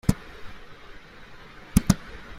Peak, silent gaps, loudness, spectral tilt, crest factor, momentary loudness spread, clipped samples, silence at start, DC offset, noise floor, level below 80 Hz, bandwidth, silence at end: -2 dBFS; none; -26 LUFS; -5.5 dB/octave; 28 dB; 24 LU; under 0.1%; 0.05 s; under 0.1%; -45 dBFS; -38 dBFS; 16 kHz; 0 s